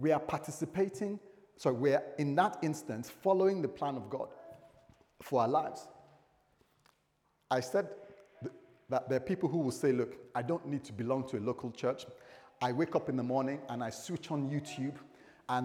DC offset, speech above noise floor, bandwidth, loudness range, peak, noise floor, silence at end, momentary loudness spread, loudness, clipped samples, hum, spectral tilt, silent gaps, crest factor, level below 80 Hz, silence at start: under 0.1%; 42 dB; 17 kHz; 6 LU; -14 dBFS; -76 dBFS; 0 s; 16 LU; -35 LUFS; under 0.1%; none; -6.5 dB/octave; none; 20 dB; -76 dBFS; 0 s